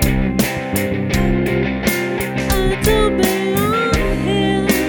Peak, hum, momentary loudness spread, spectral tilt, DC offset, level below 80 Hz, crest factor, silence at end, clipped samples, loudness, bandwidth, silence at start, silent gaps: -2 dBFS; none; 4 LU; -5 dB/octave; under 0.1%; -26 dBFS; 14 dB; 0 s; under 0.1%; -17 LUFS; 19.5 kHz; 0 s; none